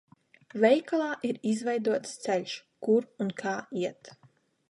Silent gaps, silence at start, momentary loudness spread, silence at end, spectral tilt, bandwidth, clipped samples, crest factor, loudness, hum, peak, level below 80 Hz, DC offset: none; 0.55 s; 11 LU; 0.55 s; -5 dB/octave; 11.5 kHz; under 0.1%; 22 dB; -29 LUFS; none; -8 dBFS; -80 dBFS; under 0.1%